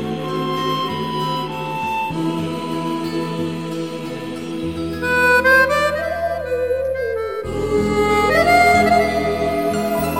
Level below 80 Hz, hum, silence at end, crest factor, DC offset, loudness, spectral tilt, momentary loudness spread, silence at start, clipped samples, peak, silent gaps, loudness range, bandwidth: -40 dBFS; none; 0 s; 18 dB; 0.4%; -18 LUFS; -5 dB/octave; 12 LU; 0 s; under 0.1%; 0 dBFS; none; 7 LU; 16.5 kHz